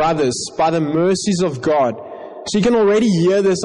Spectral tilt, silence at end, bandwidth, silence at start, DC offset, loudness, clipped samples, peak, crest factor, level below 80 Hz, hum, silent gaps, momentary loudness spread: -5.5 dB/octave; 0 s; 10.5 kHz; 0 s; under 0.1%; -16 LUFS; under 0.1%; -8 dBFS; 8 dB; -48 dBFS; none; none; 8 LU